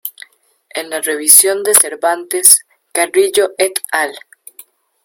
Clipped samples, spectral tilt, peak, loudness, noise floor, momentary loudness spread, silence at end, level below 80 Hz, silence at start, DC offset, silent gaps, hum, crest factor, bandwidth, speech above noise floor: 0.7%; 1 dB/octave; 0 dBFS; -11 LUFS; -50 dBFS; 15 LU; 0.85 s; -64 dBFS; 0.05 s; under 0.1%; none; none; 14 dB; over 20 kHz; 37 dB